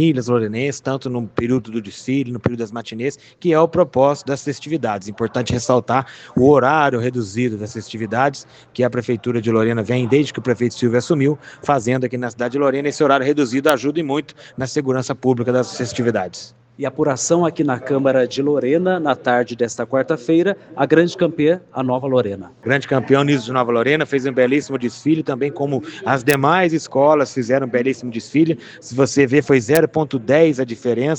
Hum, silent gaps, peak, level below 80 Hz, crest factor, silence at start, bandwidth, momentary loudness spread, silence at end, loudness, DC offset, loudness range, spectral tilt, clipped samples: none; none; 0 dBFS; -56 dBFS; 18 dB; 0 s; 9.6 kHz; 9 LU; 0 s; -18 LUFS; under 0.1%; 3 LU; -6 dB/octave; under 0.1%